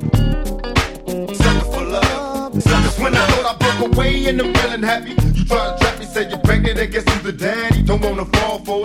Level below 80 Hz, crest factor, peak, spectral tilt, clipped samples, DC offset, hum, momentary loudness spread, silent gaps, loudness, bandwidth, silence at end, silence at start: -22 dBFS; 16 dB; 0 dBFS; -5.5 dB/octave; under 0.1%; under 0.1%; none; 6 LU; none; -17 LUFS; 16 kHz; 0 s; 0 s